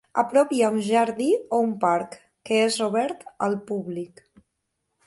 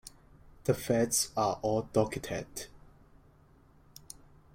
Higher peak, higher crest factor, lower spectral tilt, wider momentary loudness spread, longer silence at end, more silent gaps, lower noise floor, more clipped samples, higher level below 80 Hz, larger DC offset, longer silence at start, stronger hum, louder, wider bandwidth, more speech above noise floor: first, -6 dBFS vs -12 dBFS; about the same, 18 dB vs 22 dB; about the same, -4.5 dB/octave vs -4.5 dB/octave; second, 13 LU vs 22 LU; second, 1 s vs 1.8 s; neither; first, -78 dBFS vs -61 dBFS; neither; second, -70 dBFS vs -58 dBFS; neither; about the same, 0.15 s vs 0.05 s; neither; first, -23 LUFS vs -31 LUFS; second, 11.5 kHz vs 16.5 kHz; first, 55 dB vs 30 dB